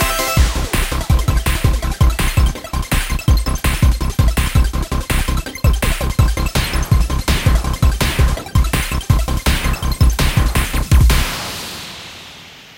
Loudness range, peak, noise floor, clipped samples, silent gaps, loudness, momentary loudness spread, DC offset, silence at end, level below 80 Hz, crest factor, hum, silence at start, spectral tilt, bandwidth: 1 LU; 0 dBFS; -38 dBFS; under 0.1%; none; -17 LUFS; 6 LU; under 0.1%; 0.15 s; -18 dBFS; 14 dB; none; 0 s; -4.5 dB/octave; 17 kHz